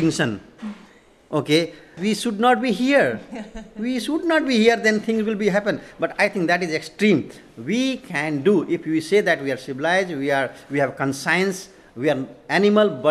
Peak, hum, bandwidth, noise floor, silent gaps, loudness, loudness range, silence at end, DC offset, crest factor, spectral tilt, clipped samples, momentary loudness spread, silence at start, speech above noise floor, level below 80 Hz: -4 dBFS; none; 13.5 kHz; -50 dBFS; none; -21 LUFS; 2 LU; 0 s; under 0.1%; 18 dB; -5 dB/octave; under 0.1%; 13 LU; 0 s; 29 dB; -56 dBFS